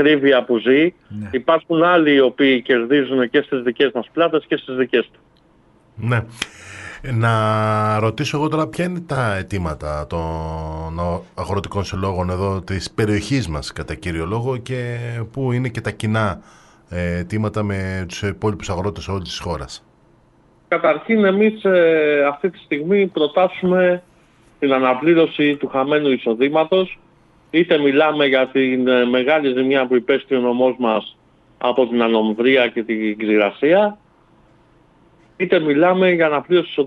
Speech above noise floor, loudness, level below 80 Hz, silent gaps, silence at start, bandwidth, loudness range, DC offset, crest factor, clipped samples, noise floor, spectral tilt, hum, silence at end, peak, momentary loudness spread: 36 dB; -18 LUFS; -44 dBFS; none; 0 s; 12 kHz; 7 LU; under 0.1%; 18 dB; under 0.1%; -54 dBFS; -6.5 dB/octave; none; 0 s; 0 dBFS; 11 LU